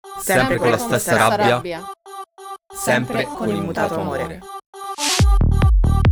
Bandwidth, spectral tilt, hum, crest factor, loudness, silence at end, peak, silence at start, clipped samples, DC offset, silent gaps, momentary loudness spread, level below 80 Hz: over 20 kHz; -5 dB/octave; none; 16 dB; -18 LUFS; 0 s; -2 dBFS; 0.05 s; under 0.1%; under 0.1%; 4.66-4.73 s; 19 LU; -24 dBFS